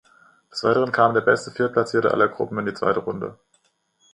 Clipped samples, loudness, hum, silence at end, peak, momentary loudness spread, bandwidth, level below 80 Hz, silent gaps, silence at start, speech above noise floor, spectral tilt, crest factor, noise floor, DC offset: under 0.1%; -21 LUFS; none; 0.8 s; -4 dBFS; 12 LU; 10.5 kHz; -62 dBFS; none; 0.55 s; 45 dB; -6 dB/octave; 20 dB; -66 dBFS; under 0.1%